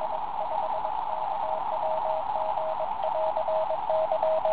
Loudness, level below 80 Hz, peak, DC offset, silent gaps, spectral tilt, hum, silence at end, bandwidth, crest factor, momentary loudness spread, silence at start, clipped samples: -29 LUFS; -62 dBFS; -12 dBFS; 1%; none; -7.5 dB/octave; none; 0 s; 4 kHz; 14 dB; 5 LU; 0 s; under 0.1%